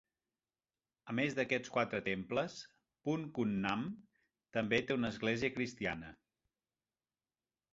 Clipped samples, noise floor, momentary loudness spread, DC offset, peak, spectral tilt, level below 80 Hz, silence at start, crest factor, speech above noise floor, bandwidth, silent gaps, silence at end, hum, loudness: under 0.1%; under -90 dBFS; 11 LU; under 0.1%; -16 dBFS; -4 dB/octave; -68 dBFS; 1.05 s; 22 dB; over 53 dB; 7.6 kHz; none; 1.6 s; none; -37 LUFS